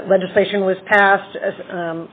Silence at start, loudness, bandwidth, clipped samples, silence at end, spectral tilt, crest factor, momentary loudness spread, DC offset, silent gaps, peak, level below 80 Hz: 0 s; -17 LUFS; 4.8 kHz; under 0.1%; 0.05 s; -3 dB/octave; 16 dB; 13 LU; under 0.1%; none; 0 dBFS; -62 dBFS